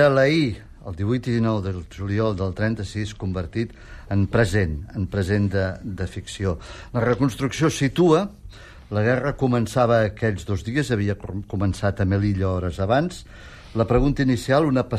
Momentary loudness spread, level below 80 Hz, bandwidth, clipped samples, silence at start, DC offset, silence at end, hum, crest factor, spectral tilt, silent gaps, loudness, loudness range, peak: 11 LU; -40 dBFS; 13.5 kHz; under 0.1%; 0 s; under 0.1%; 0 s; none; 16 dB; -7 dB/octave; none; -23 LUFS; 3 LU; -6 dBFS